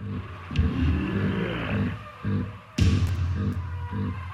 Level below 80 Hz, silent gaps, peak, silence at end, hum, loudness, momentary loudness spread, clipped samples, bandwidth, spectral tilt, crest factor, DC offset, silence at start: -34 dBFS; none; -8 dBFS; 0 s; none; -28 LUFS; 9 LU; under 0.1%; 9.8 kHz; -7 dB/octave; 18 dB; under 0.1%; 0 s